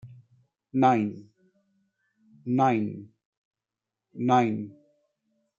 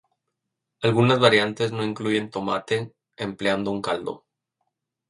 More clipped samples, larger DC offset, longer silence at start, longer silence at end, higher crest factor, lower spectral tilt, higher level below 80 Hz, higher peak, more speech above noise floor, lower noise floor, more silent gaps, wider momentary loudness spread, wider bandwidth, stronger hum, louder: neither; neither; second, 0.05 s vs 0.8 s; about the same, 0.9 s vs 0.9 s; about the same, 22 dB vs 22 dB; first, -7.5 dB/octave vs -5.5 dB/octave; second, -76 dBFS vs -62 dBFS; second, -8 dBFS vs -2 dBFS; first, 64 dB vs 59 dB; first, -89 dBFS vs -82 dBFS; first, 3.25-3.51 s vs none; first, 20 LU vs 16 LU; second, 7.4 kHz vs 11 kHz; neither; second, -26 LUFS vs -23 LUFS